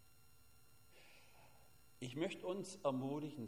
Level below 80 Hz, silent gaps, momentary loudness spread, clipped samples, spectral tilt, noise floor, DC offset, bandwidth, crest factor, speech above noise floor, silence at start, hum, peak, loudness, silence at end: -78 dBFS; none; 24 LU; under 0.1%; -5.5 dB/octave; -70 dBFS; under 0.1%; 16 kHz; 22 dB; 27 dB; 0.95 s; none; -26 dBFS; -44 LUFS; 0 s